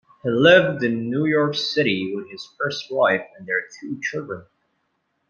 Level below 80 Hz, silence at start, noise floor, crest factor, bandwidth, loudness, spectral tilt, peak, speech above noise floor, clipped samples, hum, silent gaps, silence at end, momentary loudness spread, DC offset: -64 dBFS; 0.25 s; -72 dBFS; 20 dB; 7.2 kHz; -21 LUFS; -5.5 dB/octave; -2 dBFS; 51 dB; under 0.1%; none; none; 0.9 s; 17 LU; under 0.1%